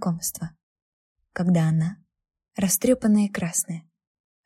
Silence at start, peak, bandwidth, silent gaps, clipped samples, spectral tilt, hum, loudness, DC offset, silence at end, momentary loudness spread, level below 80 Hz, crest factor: 0 s; -8 dBFS; 15.5 kHz; 0.63-0.76 s, 0.82-1.16 s; under 0.1%; -5.5 dB/octave; none; -23 LUFS; under 0.1%; 0.65 s; 17 LU; -58 dBFS; 16 dB